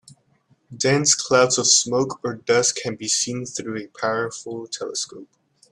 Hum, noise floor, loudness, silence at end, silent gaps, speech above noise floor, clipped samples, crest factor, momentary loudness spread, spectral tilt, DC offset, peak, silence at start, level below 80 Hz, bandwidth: none; -62 dBFS; -20 LUFS; 0.5 s; none; 40 dB; under 0.1%; 20 dB; 14 LU; -2.5 dB/octave; under 0.1%; -2 dBFS; 0.7 s; -64 dBFS; 13 kHz